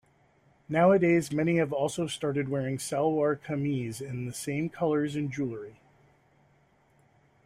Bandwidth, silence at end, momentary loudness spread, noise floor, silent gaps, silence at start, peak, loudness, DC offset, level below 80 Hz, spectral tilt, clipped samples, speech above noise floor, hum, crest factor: 15.5 kHz; 1.75 s; 12 LU; -65 dBFS; none; 0.7 s; -10 dBFS; -28 LUFS; under 0.1%; -66 dBFS; -6 dB/octave; under 0.1%; 37 dB; none; 18 dB